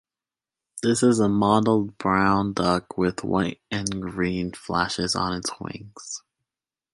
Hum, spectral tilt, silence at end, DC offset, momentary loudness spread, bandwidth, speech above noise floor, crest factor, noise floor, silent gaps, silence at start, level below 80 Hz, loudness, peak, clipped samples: none; -5 dB/octave; 0.75 s; under 0.1%; 16 LU; 11.5 kHz; over 67 dB; 20 dB; under -90 dBFS; none; 0.75 s; -50 dBFS; -23 LUFS; -6 dBFS; under 0.1%